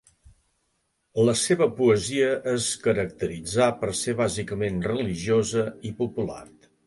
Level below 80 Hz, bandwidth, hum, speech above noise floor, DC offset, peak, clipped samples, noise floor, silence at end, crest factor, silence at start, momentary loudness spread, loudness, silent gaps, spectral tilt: -52 dBFS; 11.5 kHz; none; 49 dB; under 0.1%; -8 dBFS; under 0.1%; -73 dBFS; 0.4 s; 18 dB; 1.15 s; 10 LU; -25 LUFS; none; -4.5 dB/octave